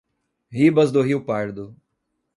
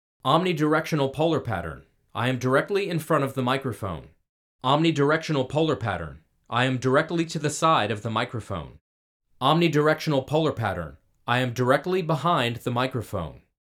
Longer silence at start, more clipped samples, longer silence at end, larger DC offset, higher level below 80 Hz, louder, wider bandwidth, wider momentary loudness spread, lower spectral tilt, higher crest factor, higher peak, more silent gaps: first, 0.5 s vs 0.25 s; neither; first, 0.65 s vs 0.25 s; neither; second, -62 dBFS vs -56 dBFS; first, -20 LUFS vs -24 LUFS; second, 11.5 kHz vs 16.5 kHz; first, 19 LU vs 13 LU; first, -7.5 dB/octave vs -5.5 dB/octave; about the same, 18 dB vs 20 dB; about the same, -4 dBFS vs -4 dBFS; second, none vs 4.29-4.59 s, 8.81-9.20 s